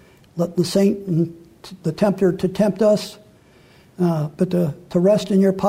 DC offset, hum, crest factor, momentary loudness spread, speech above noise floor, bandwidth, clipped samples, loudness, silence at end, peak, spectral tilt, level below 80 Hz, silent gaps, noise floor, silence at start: under 0.1%; none; 14 dB; 10 LU; 32 dB; 15.5 kHz; under 0.1%; -20 LUFS; 0 s; -6 dBFS; -7 dB/octave; -54 dBFS; none; -50 dBFS; 0.35 s